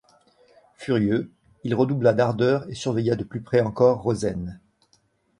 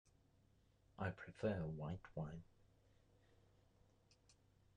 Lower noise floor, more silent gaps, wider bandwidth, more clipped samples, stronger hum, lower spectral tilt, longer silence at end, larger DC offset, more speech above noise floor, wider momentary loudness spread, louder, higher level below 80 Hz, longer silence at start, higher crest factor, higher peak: second, -65 dBFS vs -75 dBFS; neither; first, 11 kHz vs 9.6 kHz; neither; neither; about the same, -7 dB/octave vs -8 dB/octave; first, 0.8 s vs 0.45 s; neither; first, 43 dB vs 28 dB; first, 14 LU vs 8 LU; first, -23 LUFS vs -48 LUFS; first, -52 dBFS vs -70 dBFS; second, 0.8 s vs 1 s; about the same, 18 dB vs 22 dB; first, -4 dBFS vs -30 dBFS